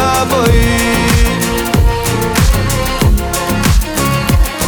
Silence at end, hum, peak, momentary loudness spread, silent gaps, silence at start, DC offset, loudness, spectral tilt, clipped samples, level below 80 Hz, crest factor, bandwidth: 0 s; none; 0 dBFS; 3 LU; none; 0 s; under 0.1%; -12 LUFS; -4.5 dB/octave; under 0.1%; -16 dBFS; 12 dB; over 20 kHz